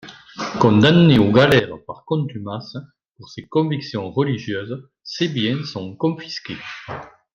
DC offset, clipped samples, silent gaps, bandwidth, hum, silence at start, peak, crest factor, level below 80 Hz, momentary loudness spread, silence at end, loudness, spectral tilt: under 0.1%; under 0.1%; none; 9.8 kHz; none; 0.05 s; 0 dBFS; 20 dB; -52 dBFS; 21 LU; 0.25 s; -18 LUFS; -7 dB/octave